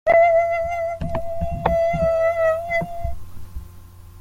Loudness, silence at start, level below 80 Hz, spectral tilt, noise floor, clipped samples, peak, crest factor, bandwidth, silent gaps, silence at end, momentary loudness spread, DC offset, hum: -20 LUFS; 0.05 s; -36 dBFS; -7 dB/octave; -41 dBFS; under 0.1%; -4 dBFS; 16 dB; 15.5 kHz; none; 0 s; 23 LU; under 0.1%; none